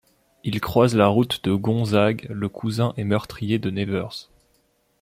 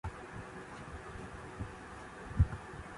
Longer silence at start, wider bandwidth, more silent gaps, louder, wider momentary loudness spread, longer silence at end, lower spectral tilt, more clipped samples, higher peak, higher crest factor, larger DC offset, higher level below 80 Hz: first, 0.45 s vs 0.05 s; first, 16 kHz vs 11.5 kHz; neither; first, -22 LUFS vs -41 LUFS; second, 11 LU vs 14 LU; first, 0.8 s vs 0 s; about the same, -7 dB/octave vs -7 dB/octave; neither; first, -2 dBFS vs -16 dBFS; about the same, 20 dB vs 24 dB; neither; second, -54 dBFS vs -44 dBFS